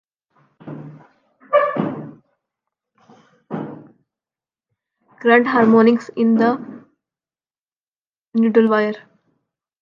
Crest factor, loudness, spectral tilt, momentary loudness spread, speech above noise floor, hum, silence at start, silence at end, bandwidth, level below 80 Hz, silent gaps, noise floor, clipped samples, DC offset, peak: 18 dB; -16 LUFS; -8 dB/octave; 22 LU; over 75 dB; none; 0.65 s; 0.85 s; 7 kHz; -72 dBFS; 7.61-7.66 s, 7.80-7.84 s, 7.96-8.13 s, 8.19-8.32 s; under -90 dBFS; under 0.1%; under 0.1%; -2 dBFS